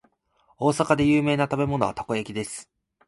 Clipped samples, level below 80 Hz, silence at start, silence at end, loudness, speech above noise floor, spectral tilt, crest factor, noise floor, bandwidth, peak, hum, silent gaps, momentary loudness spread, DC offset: under 0.1%; -52 dBFS; 0.6 s; 0.45 s; -24 LUFS; 42 dB; -6 dB/octave; 20 dB; -65 dBFS; 11.5 kHz; -4 dBFS; none; none; 12 LU; under 0.1%